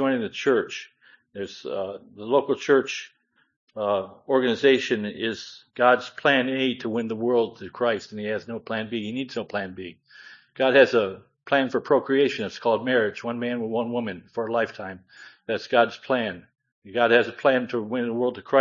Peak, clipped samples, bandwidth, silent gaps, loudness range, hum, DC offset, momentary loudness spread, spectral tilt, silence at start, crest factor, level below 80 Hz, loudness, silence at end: -4 dBFS; under 0.1%; 7.6 kHz; 3.56-3.67 s, 16.72-16.82 s; 5 LU; none; under 0.1%; 16 LU; -5 dB/octave; 0 s; 22 dB; -74 dBFS; -24 LUFS; 0 s